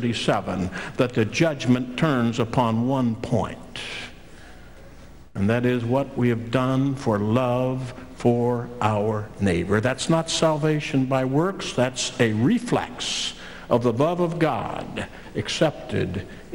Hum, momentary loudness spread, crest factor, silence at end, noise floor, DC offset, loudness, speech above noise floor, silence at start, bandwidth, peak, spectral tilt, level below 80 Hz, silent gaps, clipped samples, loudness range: none; 10 LU; 18 dB; 0 s; -45 dBFS; 0.4%; -23 LUFS; 22 dB; 0 s; 16 kHz; -6 dBFS; -5.5 dB/octave; -48 dBFS; none; under 0.1%; 4 LU